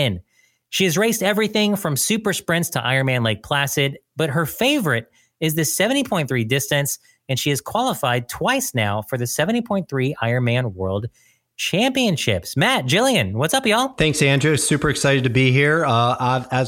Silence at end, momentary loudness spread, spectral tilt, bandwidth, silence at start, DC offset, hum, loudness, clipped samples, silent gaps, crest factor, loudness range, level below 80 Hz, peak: 0 s; 7 LU; -4 dB/octave; 17 kHz; 0 s; under 0.1%; none; -19 LUFS; under 0.1%; none; 18 dB; 4 LU; -50 dBFS; -2 dBFS